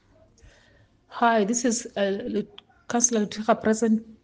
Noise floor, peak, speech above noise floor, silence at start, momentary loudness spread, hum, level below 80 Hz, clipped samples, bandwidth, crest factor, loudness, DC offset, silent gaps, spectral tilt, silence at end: -59 dBFS; -6 dBFS; 35 dB; 1.1 s; 9 LU; none; -62 dBFS; under 0.1%; 10 kHz; 20 dB; -24 LUFS; under 0.1%; none; -3.5 dB/octave; 0.1 s